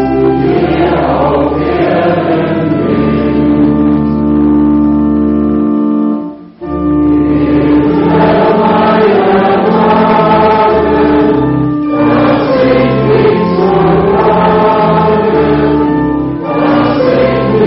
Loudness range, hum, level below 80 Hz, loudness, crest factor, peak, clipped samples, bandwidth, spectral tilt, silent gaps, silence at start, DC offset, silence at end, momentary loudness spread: 3 LU; none; -30 dBFS; -9 LUFS; 8 dB; 0 dBFS; under 0.1%; 5.8 kHz; -6.5 dB/octave; none; 0 s; under 0.1%; 0 s; 4 LU